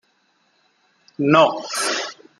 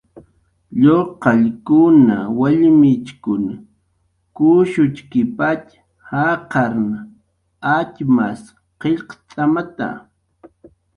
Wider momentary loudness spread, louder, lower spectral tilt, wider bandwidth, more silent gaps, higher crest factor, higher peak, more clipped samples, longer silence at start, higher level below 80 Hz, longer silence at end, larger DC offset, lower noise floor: second, 9 LU vs 14 LU; about the same, -18 LUFS vs -16 LUFS; second, -4 dB/octave vs -8.5 dB/octave; first, 15 kHz vs 10 kHz; neither; about the same, 20 dB vs 16 dB; about the same, -2 dBFS vs 0 dBFS; neither; first, 1.2 s vs 0.15 s; second, -70 dBFS vs -54 dBFS; second, 0.25 s vs 1 s; neither; about the same, -64 dBFS vs -64 dBFS